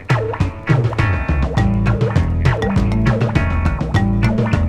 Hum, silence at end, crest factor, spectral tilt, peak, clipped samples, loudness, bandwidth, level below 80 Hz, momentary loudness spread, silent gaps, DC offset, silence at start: none; 0 s; 16 dB; -8 dB/octave; 0 dBFS; under 0.1%; -17 LUFS; 9.6 kHz; -24 dBFS; 3 LU; none; under 0.1%; 0 s